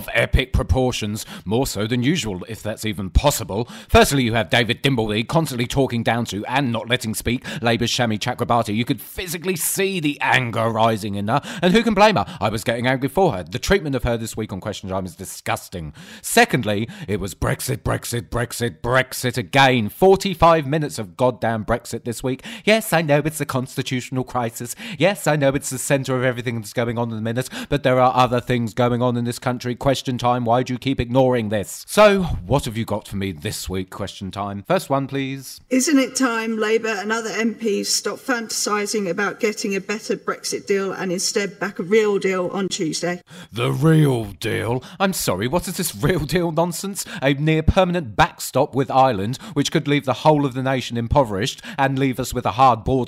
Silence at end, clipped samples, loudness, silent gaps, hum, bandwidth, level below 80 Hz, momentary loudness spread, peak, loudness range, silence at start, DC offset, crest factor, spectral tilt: 0 s; under 0.1%; -20 LUFS; none; none; 16 kHz; -36 dBFS; 10 LU; -4 dBFS; 4 LU; 0 s; under 0.1%; 16 dB; -5 dB/octave